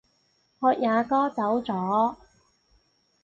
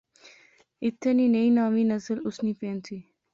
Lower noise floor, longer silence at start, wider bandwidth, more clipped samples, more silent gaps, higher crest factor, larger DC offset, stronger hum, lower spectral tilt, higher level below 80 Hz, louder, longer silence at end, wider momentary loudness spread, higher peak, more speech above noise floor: first, -68 dBFS vs -58 dBFS; second, 0.6 s vs 0.8 s; about the same, 7.6 kHz vs 7.4 kHz; neither; neither; first, 18 dB vs 12 dB; neither; neither; about the same, -7.5 dB/octave vs -7 dB/octave; about the same, -66 dBFS vs -70 dBFS; about the same, -25 LUFS vs -26 LUFS; first, 1.1 s vs 0.3 s; second, 4 LU vs 14 LU; first, -10 dBFS vs -14 dBFS; first, 44 dB vs 33 dB